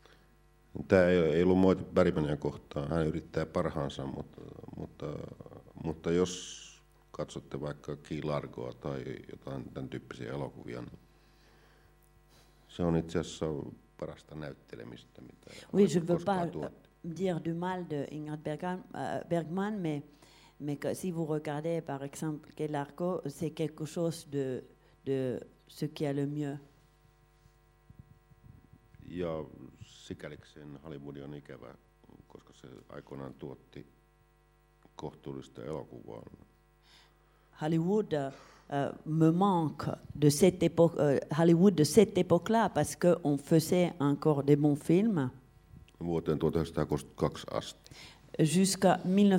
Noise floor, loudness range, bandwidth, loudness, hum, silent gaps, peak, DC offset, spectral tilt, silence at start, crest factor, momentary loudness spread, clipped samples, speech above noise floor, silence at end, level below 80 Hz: -66 dBFS; 19 LU; 16 kHz; -31 LUFS; none; none; -10 dBFS; under 0.1%; -6.5 dB/octave; 0.75 s; 24 dB; 21 LU; under 0.1%; 34 dB; 0 s; -58 dBFS